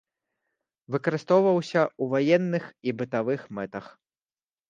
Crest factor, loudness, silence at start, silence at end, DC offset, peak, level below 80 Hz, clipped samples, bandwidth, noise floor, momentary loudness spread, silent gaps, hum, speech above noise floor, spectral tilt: 20 dB; -26 LUFS; 0.9 s; 0.8 s; under 0.1%; -8 dBFS; -72 dBFS; under 0.1%; 7.6 kHz; under -90 dBFS; 13 LU; none; none; over 65 dB; -7 dB/octave